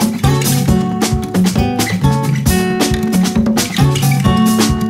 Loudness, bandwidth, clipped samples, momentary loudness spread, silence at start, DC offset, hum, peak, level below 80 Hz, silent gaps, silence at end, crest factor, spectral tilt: -13 LUFS; 16.5 kHz; under 0.1%; 3 LU; 0 s; under 0.1%; none; 0 dBFS; -26 dBFS; none; 0 s; 12 dB; -5.5 dB/octave